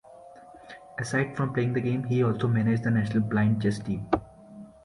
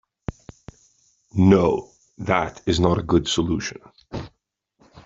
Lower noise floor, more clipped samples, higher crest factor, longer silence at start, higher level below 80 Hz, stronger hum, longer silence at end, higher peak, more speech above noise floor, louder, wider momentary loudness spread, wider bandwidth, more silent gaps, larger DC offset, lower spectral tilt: second, -49 dBFS vs -71 dBFS; neither; about the same, 20 dB vs 20 dB; second, 0.1 s vs 0.3 s; second, -54 dBFS vs -44 dBFS; neither; about the same, 0.15 s vs 0.05 s; second, -8 dBFS vs -2 dBFS; second, 23 dB vs 51 dB; second, -27 LUFS vs -21 LUFS; second, 16 LU vs 19 LU; first, 11 kHz vs 7.8 kHz; neither; neither; first, -7.5 dB/octave vs -6 dB/octave